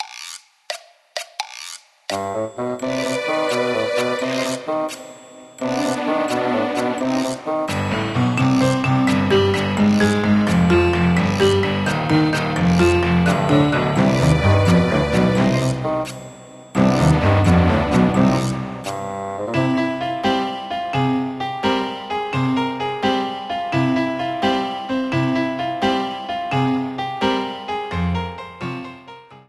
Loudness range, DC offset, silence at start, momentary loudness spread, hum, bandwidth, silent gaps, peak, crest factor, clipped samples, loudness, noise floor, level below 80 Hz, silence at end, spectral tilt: 6 LU; under 0.1%; 0 s; 13 LU; none; 13 kHz; none; -2 dBFS; 16 dB; under 0.1%; -19 LUFS; -41 dBFS; -40 dBFS; 0.15 s; -6 dB/octave